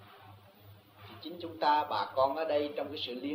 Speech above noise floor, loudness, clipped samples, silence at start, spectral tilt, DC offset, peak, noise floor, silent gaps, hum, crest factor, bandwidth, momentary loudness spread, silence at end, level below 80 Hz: 25 dB; -32 LUFS; under 0.1%; 0 s; -6 dB/octave; under 0.1%; -14 dBFS; -57 dBFS; none; none; 20 dB; 16 kHz; 16 LU; 0 s; -76 dBFS